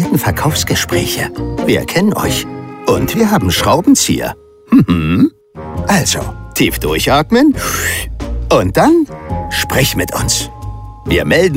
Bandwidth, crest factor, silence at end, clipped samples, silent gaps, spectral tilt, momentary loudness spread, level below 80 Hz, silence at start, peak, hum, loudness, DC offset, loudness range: 16.5 kHz; 14 dB; 0 s; under 0.1%; none; -4.5 dB/octave; 12 LU; -28 dBFS; 0 s; 0 dBFS; none; -13 LUFS; under 0.1%; 2 LU